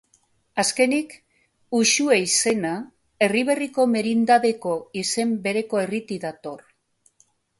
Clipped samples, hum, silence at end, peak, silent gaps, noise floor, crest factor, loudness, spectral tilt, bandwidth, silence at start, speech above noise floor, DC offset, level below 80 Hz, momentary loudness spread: under 0.1%; none; 1 s; -4 dBFS; none; -64 dBFS; 20 dB; -22 LUFS; -3 dB/octave; 11.5 kHz; 0.55 s; 43 dB; under 0.1%; -68 dBFS; 14 LU